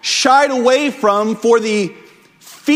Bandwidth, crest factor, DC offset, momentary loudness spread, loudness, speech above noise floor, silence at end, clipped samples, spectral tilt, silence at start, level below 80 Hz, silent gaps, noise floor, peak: 16 kHz; 14 dB; under 0.1%; 9 LU; -14 LUFS; 30 dB; 0 s; under 0.1%; -3 dB/octave; 0.05 s; -64 dBFS; none; -43 dBFS; 0 dBFS